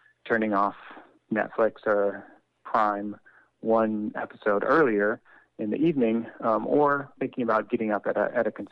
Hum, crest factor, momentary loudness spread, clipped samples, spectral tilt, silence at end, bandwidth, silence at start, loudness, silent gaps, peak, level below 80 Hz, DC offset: none; 16 dB; 11 LU; under 0.1%; -8.5 dB/octave; 0.05 s; 6 kHz; 0.25 s; -26 LUFS; none; -10 dBFS; -70 dBFS; under 0.1%